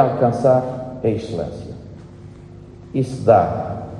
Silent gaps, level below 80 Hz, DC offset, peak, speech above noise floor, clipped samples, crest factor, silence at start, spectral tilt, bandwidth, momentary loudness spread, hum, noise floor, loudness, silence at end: none; -48 dBFS; under 0.1%; -2 dBFS; 21 dB; under 0.1%; 18 dB; 0 s; -8.5 dB/octave; 10.5 kHz; 25 LU; none; -39 dBFS; -19 LUFS; 0 s